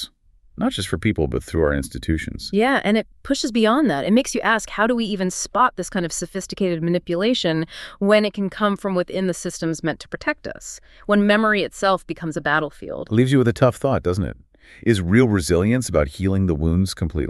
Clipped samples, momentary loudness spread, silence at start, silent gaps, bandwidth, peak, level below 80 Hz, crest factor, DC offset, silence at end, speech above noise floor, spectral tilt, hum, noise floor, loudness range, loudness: under 0.1%; 9 LU; 0 s; none; 13.5 kHz; -2 dBFS; -38 dBFS; 18 dB; under 0.1%; 0 s; 32 dB; -5.5 dB/octave; none; -53 dBFS; 3 LU; -21 LUFS